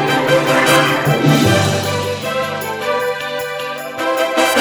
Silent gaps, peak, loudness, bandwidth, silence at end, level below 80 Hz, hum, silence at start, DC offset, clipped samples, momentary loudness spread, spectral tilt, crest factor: none; 0 dBFS; -15 LUFS; over 20 kHz; 0 s; -50 dBFS; none; 0 s; under 0.1%; under 0.1%; 10 LU; -4.5 dB/octave; 16 dB